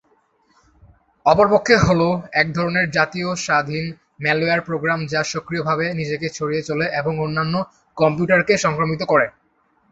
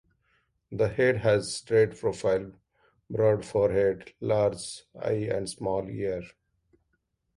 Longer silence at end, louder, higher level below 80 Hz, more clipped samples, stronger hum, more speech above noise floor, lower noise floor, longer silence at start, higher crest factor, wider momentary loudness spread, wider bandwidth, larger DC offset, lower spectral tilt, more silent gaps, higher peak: second, 0.6 s vs 1.1 s; first, -19 LUFS vs -27 LUFS; first, -48 dBFS vs -56 dBFS; neither; neither; second, 43 dB vs 50 dB; second, -62 dBFS vs -76 dBFS; first, 1.25 s vs 0.7 s; about the same, 18 dB vs 18 dB; second, 9 LU vs 12 LU; second, 8.2 kHz vs 11.5 kHz; neither; about the same, -5 dB/octave vs -5.5 dB/octave; neither; first, -2 dBFS vs -10 dBFS